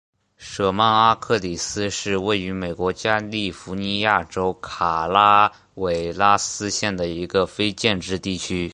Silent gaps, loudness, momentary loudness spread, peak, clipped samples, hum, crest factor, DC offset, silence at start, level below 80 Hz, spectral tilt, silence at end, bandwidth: none; -21 LUFS; 10 LU; -2 dBFS; under 0.1%; none; 20 dB; under 0.1%; 0.4 s; -46 dBFS; -3.5 dB/octave; 0 s; 11 kHz